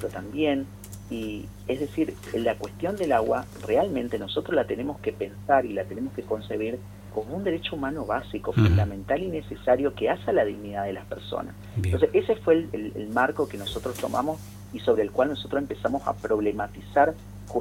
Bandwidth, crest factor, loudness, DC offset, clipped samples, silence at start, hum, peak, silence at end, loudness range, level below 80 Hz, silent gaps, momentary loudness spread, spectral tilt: 16.5 kHz; 20 dB; -27 LUFS; under 0.1%; under 0.1%; 0 s; 50 Hz at -45 dBFS; -8 dBFS; 0 s; 3 LU; -46 dBFS; none; 11 LU; -7 dB/octave